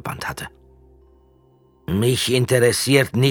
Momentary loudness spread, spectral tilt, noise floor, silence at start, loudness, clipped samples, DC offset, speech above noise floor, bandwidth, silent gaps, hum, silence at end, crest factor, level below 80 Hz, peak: 18 LU; -4.5 dB/octave; -55 dBFS; 0.05 s; -19 LUFS; under 0.1%; under 0.1%; 38 dB; 18.5 kHz; none; none; 0 s; 20 dB; -48 dBFS; -2 dBFS